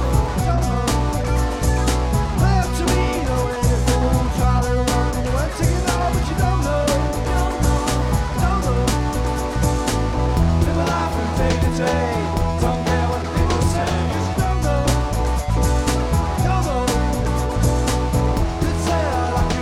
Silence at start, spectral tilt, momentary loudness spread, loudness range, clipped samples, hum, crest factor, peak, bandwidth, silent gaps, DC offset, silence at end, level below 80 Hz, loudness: 0 s; -5.5 dB/octave; 3 LU; 1 LU; under 0.1%; none; 14 dB; -4 dBFS; 15.5 kHz; none; under 0.1%; 0 s; -22 dBFS; -20 LUFS